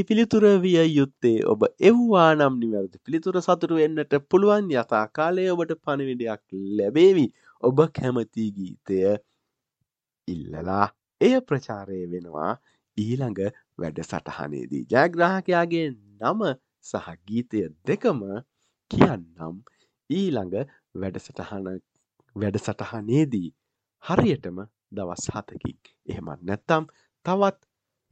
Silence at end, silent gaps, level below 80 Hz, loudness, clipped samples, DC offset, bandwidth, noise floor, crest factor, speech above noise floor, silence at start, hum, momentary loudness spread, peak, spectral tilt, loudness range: 0.6 s; none; -58 dBFS; -24 LUFS; under 0.1%; under 0.1%; 8.6 kHz; -81 dBFS; 22 dB; 58 dB; 0 s; none; 18 LU; -2 dBFS; -7 dB/octave; 9 LU